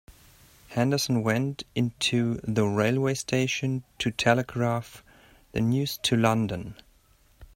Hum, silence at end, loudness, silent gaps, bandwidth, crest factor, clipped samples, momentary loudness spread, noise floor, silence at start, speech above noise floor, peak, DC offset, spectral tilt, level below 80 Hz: none; 0.1 s; -26 LUFS; none; 16.5 kHz; 22 dB; under 0.1%; 8 LU; -61 dBFS; 0.1 s; 35 dB; -4 dBFS; under 0.1%; -5 dB/octave; -56 dBFS